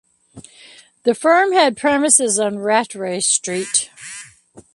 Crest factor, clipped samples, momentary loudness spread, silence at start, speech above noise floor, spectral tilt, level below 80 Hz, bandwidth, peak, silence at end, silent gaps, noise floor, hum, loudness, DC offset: 18 dB; under 0.1%; 15 LU; 0.35 s; 28 dB; -2 dB/octave; -64 dBFS; 12 kHz; 0 dBFS; 0.15 s; none; -46 dBFS; none; -16 LUFS; under 0.1%